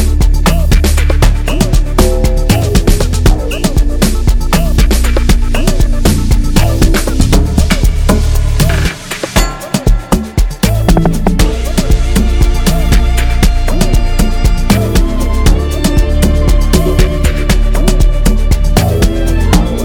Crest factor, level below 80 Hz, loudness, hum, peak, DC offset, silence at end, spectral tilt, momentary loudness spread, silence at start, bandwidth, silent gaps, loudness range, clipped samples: 8 dB; -10 dBFS; -12 LUFS; none; 0 dBFS; under 0.1%; 0 s; -5.5 dB/octave; 3 LU; 0 s; 18 kHz; none; 1 LU; 0.1%